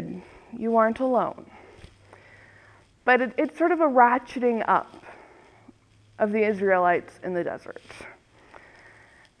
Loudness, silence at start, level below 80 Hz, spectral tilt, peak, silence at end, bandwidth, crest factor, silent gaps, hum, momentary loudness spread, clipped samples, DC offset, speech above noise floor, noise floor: -23 LUFS; 0 s; -64 dBFS; -7 dB/octave; -4 dBFS; 1.3 s; 11 kHz; 22 dB; none; none; 22 LU; under 0.1%; under 0.1%; 32 dB; -55 dBFS